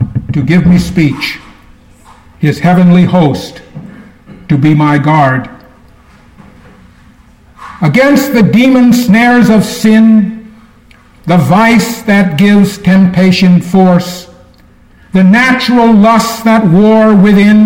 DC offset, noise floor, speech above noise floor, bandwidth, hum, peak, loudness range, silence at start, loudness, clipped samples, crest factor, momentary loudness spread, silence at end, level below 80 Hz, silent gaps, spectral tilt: under 0.1%; -41 dBFS; 34 dB; 17 kHz; none; 0 dBFS; 6 LU; 0 s; -7 LUFS; under 0.1%; 8 dB; 10 LU; 0 s; -36 dBFS; none; -6.5 dB/octave